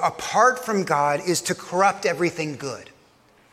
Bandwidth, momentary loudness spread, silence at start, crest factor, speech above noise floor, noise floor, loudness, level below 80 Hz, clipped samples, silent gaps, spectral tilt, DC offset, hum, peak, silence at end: 16.5 kHz; 12 LU; 0 s; 18 dB; 34 dB; -57 dBFS; -22 LUFS; -66 dBFS; under 0.1%; none; -3.5 dB/octave; under 0.1%; none; -4 dBFS; 0.7 s